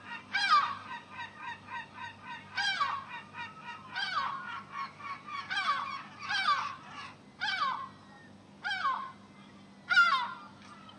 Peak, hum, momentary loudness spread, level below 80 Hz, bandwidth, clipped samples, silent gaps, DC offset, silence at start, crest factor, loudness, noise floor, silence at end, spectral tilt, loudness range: -14 dBFS; none; 20 LU; -78 dBFS; 11 kHz; under 0.1%; none; under 0.1%; 0 s; 20 dB; -33 LUFS; -54 dBFS; 0 s; -1.5 dB/octave; 5 LU